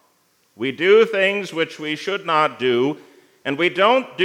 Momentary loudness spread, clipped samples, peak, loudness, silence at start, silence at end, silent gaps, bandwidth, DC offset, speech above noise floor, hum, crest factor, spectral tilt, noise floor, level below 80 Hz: 13 LU; under 0.1%; -2 dBFS; -19 LUFS; 0.6 s; 0 s; none; 12.5 kHz; under 0.1%; 43 dB; none; 18 dB; -5 dB/octave; -62 dBFS; -80 dBFS